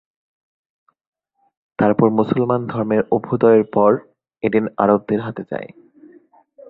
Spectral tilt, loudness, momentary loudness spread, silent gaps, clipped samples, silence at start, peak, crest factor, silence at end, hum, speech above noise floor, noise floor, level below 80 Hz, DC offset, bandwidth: -11 dB/octave; -18 LUFS; 14 LU; none; under 0.1%; 1.8 s; -2 dBFS; 18 dB; 1 s; none; 33 dB; -50 dBFS; -56 dBFS; under 0.1%; 4.5 kHz